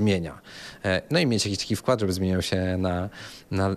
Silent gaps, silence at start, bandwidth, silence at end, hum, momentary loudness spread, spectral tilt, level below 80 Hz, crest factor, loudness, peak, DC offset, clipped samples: none; 0 s; 14.5 kHz; 0 s; none; 13 LU; -5 dB/octave; -56 dBFS; 16 dB; -26 LUFS; -8 dBFS; under 0.1%; under 0.1%